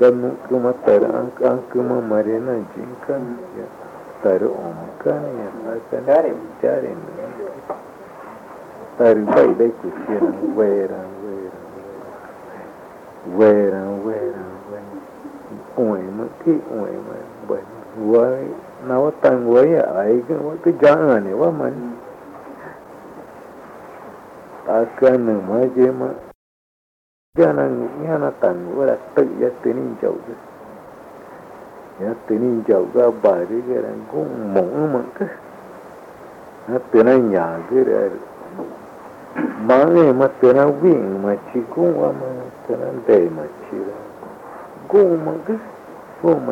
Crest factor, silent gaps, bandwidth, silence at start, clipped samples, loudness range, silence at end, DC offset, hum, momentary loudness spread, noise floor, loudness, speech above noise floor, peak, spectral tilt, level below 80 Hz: 16 dB; 26.35-27.33 s; 9.8 kHz; 0 s; under 0.1%; 8 LU; 0 s; under 0.1%; none; 24 LU; -39 dBFS; -18 LUFS; 22 dB; -2 dBFS; -8.5 dB/octave; -62 dBFS